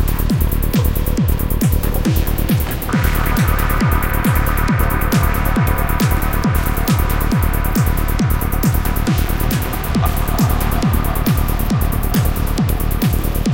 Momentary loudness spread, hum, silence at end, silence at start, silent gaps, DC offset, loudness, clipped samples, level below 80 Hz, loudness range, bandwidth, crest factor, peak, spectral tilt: 2 LU; none; 0 s; 0 s; none; 1%; -17 LUFS; under 0.1%; -18 dBFS; 1 LU; 17.5 kHz; 14 dB; -2 dBFS; -6 dB/octave